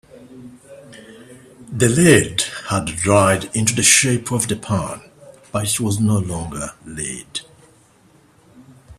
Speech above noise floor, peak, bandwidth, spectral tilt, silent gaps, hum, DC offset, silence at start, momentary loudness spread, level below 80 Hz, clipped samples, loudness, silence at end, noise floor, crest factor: 35 dB; 0 dBFS; 15 kHz; -4 dB/octave; none; none; under 0.1%; 0.15 s; 18 LU; -48 dBFS; under 0.1%; -17 LUFS; 0.05 s; -52 dBFS; 20 dB